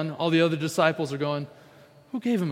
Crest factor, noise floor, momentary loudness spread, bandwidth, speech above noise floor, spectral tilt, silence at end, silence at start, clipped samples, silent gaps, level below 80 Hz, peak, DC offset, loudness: 20 dB; -53 dBFS; 11 LU; 16 kHz; 28 dB; -6 dB/octave; 0 s; 0 s; under 0.1%; none; -72 dBFS; -6 dBFS; under 0.1%; -25 LUFS